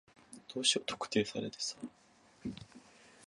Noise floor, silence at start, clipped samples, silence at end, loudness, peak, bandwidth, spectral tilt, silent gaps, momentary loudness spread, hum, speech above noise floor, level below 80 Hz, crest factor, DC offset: -59 dBFS; 0.3 s; under 0.1%; 0 s; -36 LUFS; -16 dBFS; 11.5 kHz; -2.5 dB/octave; none; 23 LU; none; 23 dB; -70 dBFS; 24 dB; under 0.1%